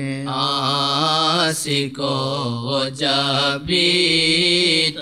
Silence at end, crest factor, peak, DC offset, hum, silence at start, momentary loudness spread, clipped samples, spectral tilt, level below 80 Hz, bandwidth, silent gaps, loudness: 0 s; 16 dB; -4 dBFS; 0.1%; none; 0 s; 8 LU; under 0.1%; -3.5 dB/octave; -54 dBFS; 15 kHz; none; -17 LUFS